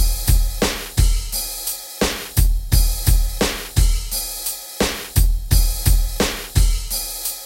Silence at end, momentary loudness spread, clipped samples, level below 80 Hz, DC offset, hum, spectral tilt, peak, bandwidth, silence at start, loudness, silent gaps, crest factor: 0 s; 5 LU; under 0.1%; -20 dBFS; under 0.1%; none; -3.5 dB/octave; -4 dBFS; 17 kHz; 0 s; -20 LUFS; none; 14 dB